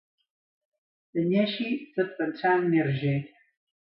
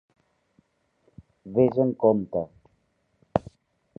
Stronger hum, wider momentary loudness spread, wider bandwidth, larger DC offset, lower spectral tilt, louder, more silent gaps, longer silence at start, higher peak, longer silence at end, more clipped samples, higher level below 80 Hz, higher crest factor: neither; about the same, 8 LU vs 10 LU; about the same, 5.6 kHz vs 5.2 kHz; neither; about the same, -11 dB/octave vs -10.5 dB/octave; about the same, -27 LUFS vs -25 LUFS; neither; second, 1.15 s vs 1.45 s; second, -12 dBFS vs -4 dBFS; about the same, 0.7 s vs 0.6 s; neither; second, -72 dBFS vs -56 dBFS; second, 16 dB vs 24 dB